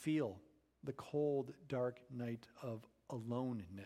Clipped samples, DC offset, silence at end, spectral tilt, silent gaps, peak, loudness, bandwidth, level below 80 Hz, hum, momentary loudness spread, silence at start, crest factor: under 0.1%; under 0.1%; 0 s; -7.5 dB/octave; none; -28 dBFS; -44 LUFS; 14.5 kHz; -78 dBFS; none; 11 LU; 0 s; 16 dB